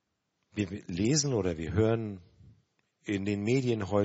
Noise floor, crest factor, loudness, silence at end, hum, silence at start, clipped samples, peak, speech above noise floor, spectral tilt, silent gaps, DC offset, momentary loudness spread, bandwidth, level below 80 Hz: -80 dBFS; 18 dB; -30 LUFS; 0 s; none; 0.55 s; under 0.1%; -14 dBFS; 51 dB; -6 dB/octave; none; under 0.1%; 14 LU; 8 kHz; -56 dBFS